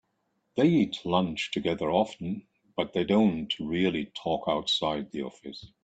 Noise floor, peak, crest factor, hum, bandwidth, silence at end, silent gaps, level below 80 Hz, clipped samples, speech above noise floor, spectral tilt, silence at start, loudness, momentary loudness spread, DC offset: -76 dBFS; -10 dBFS; 18 dB; none; 8.8 kHz; 0.15 s; none; -60 dBFS; under 0.1%; 48 dB; -6 dB/octave; 0.55 s; -28 LUFS; 13 LU; under 0.1%